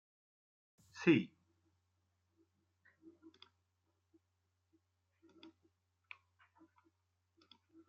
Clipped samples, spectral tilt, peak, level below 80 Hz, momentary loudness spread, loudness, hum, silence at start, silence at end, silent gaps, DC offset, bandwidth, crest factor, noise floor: under 0.1%; -5.5 dB/octave; -18 dBFS; -90 dBFS; 25 LU; -34 LUFS; none; 0.95 s; 6.6 s; none; under 0.1%; 7.4 kHz; 28 dB; -84 dBFS